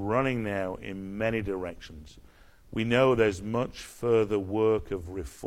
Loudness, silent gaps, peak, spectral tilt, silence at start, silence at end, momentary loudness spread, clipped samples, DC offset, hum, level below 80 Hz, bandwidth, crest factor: -28 LUFS; none; -10 dBFS; -6.5 dB/octave; 0 s; 0 s; 15 LU; under 0.1%; under 0.1%; none; -50 dBFS; 14.5 kHz; 18 dB